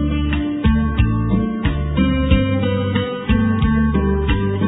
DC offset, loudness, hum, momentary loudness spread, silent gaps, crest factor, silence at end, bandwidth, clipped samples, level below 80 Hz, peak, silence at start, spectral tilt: under 0.1%; -18 LUFS; none; 4 LU; none; 16 dB; 0 s; 4 kHz; under 0.1%; -22 dBFS; -2 dBFS; 0 s; -11.5 dB/octave